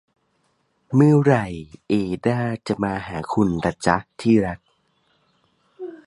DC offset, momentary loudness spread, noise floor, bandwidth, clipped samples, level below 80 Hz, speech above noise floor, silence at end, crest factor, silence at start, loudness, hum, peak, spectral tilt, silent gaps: under 0.1%; 16 LU; -67 dBFS; 11.5 kHz; under 0.1%; -48 dBFS; 47 dB; 0.1 s; 22 dB; 0.9 s; -21 LUFS; none; 0 dBFS; -7.5 dB/octave; none